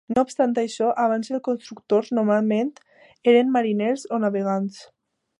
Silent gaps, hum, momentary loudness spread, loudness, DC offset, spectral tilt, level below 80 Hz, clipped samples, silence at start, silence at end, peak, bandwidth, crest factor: none; none; 9 LU; -22 LUFS; under 0.1%; -6 dB/octave; -68 dBFS; under 0.1%; 0.1 s; 0.55 s; -4 dBFS; 11 kHz; 18 dB